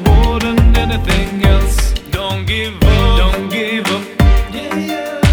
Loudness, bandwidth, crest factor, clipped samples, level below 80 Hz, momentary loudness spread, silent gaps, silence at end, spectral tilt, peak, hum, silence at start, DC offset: -14 LUFS; over 20 kHz; 12 dB; under 0.1%; -14 dBFS; 7 LU; none; 0 s; -5.5 dB/octave; 0 dBFS; none; 0 s; under 0.1%